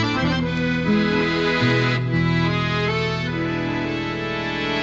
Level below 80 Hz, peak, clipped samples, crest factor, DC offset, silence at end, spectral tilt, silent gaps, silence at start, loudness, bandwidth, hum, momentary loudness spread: -42 dBFS; -8 dBFS; under 0.1%; 12 dB; under 0.1%; 0 s; -6.5 dB/octave; none; 0 s; -21 LUFS; 7.8 kHz; none; 6 LU